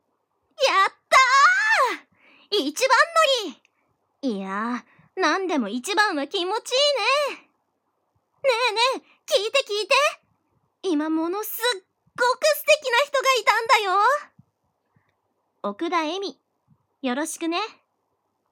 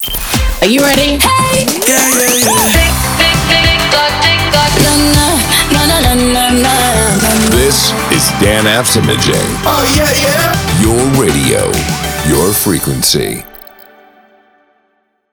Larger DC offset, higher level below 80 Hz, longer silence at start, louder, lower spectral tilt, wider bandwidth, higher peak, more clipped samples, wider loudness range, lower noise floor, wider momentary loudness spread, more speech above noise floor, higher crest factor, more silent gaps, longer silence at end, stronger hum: neither; second, -74 dBFS vs -22 dBFS; first, 0.6 s vs 0 s; second, -21 LUFS vs -9 LUFS; second, -1.5 dB/octave vs -3 dB/octave; second, 18 kHz vs over 20 kHz; second, -6 dBFS vs 0 dBFS; neither; first, 8 LU vs 4 LU; first, -74 dBFS vs -59 dBFS; first, 14 LU vs 4 LU; about the same, 51 dB vs 49 dB; first, 18 dB vs 10 dB; neither; second, 0.8 s vs 1.75 s; neither